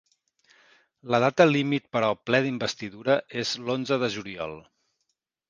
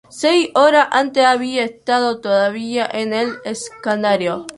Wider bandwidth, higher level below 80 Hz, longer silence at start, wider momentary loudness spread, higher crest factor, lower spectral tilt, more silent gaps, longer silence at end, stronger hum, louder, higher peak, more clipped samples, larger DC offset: second, 9.6 kHz vs 11.5 kHz; about the same, -66 dBFS vs -62 dBFS; first, 1.05 s vs 0.15 s; first, 13 LU vs 9 LU; first, 24 dB vs 16 dB; first, -5 dB/octave vs -3.5 dB/octave; neither; first, 0.9 s vs 0.05 s; neither; second, -25 LUFS vs -17 LUFS; about the same, -2 dBFS vs -2 dBFS; neither; neither